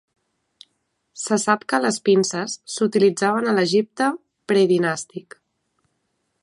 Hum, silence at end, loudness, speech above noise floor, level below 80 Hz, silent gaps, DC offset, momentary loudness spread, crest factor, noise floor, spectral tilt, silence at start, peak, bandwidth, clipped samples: none; 1.2 s; -20 LUFS; 53 dB; -74 dBFS; none; under 0.1%; 11 LU; 20 dB; -73 dBFS; -4.5 dB/octave; 1.15 s; -2 dBFS; 11.5 kHz; under 0.1%